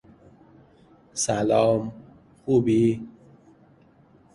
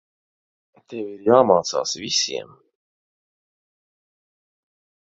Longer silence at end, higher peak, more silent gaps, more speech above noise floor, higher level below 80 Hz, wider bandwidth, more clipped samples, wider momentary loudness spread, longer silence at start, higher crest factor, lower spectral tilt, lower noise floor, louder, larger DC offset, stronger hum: second, 1.25 s vs 2.7 s; second, -8 dBFS vs 0 dBFS; neither; second, 34 dB vs over 70 dB; first, -58 dBFS vs -66 dBFS; first, 11.5 kHz vs 7.8 kHz; neither; about the same, 17 LU vs 17 LU; first, 1.15 s vs 0.9 s; second, 18 dB vs 24 dB; first, -5.5 dB/octave vs -3 dB/octave; second, -56 dBFS vs under -90 dBFS; second, -23 LUFS vs -19 LUFS; neither; neither